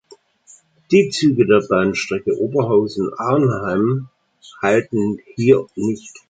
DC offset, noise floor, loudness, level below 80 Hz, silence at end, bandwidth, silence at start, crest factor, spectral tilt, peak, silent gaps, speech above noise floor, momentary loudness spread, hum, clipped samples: under 0.1%; -50 dBFS; -18 LUFS; -54 dBFS; 0.2 s; 9.2 kHz; 0.9 s; 16 dB; -6.5 dB/octave; -2 dBFS; none; 33 dB; 8 LU; none; under 0.1%